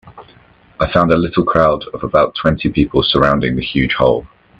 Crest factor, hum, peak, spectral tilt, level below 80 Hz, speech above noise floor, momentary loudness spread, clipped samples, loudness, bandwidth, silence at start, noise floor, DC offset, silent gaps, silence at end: 14 dB; none; 0 dBFS; -8 dB/octave; -34 dBFS; 33 dB; 4 LU; under 0.1%; -14 LUFS; 8.2 kHz; 0.05 s; -47 dBFS; under 0.1%; none; 0.35 s